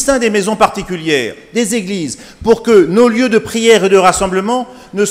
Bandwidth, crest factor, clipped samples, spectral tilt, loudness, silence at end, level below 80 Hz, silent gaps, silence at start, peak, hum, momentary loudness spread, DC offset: 16 kHz; 12 dB; 0.4%; -4 dB/octave; -12 LUFS; 0 s; -40 dBFS; none; 0 s; 0 dBFS; none; 11 LU; under 0.1%